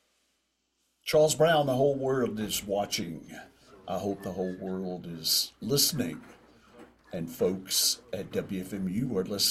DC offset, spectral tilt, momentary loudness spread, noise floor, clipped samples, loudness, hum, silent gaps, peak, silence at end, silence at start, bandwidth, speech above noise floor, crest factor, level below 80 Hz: under 0.1%; -3.5 dB/octave; 15 LU; -76 dBFS; under 0.1%; -29 LUFS; none; none; -12 dBFS; 0 s; 1.05 s; 16 kHz; 47 dB; 18 dB; -62 dBFS